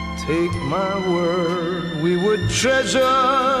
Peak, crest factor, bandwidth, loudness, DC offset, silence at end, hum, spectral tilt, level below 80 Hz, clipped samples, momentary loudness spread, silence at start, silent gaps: -6 dBFS; 12 dB; 14 kHz; -19 LUFS; under 0.1%; 0 s; none; -4.5 dB/octave; -40 dBFS; under 0.1%; 6 LU; 0 s; none